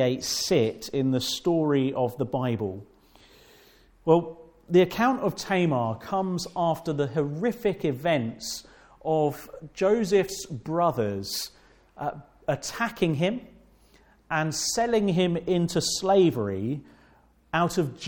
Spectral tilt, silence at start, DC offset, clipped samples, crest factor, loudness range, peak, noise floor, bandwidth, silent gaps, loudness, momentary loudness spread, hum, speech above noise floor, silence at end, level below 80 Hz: -5 dB/octave; 0 s; under 0.1%; under 0.1%; 20 dB; 4 LU; -6 dBFS; -59 dBFS; 18 kHz; none; -26 LUFS; 12 LU; none; 34 dB; 0 s; -58 dBFS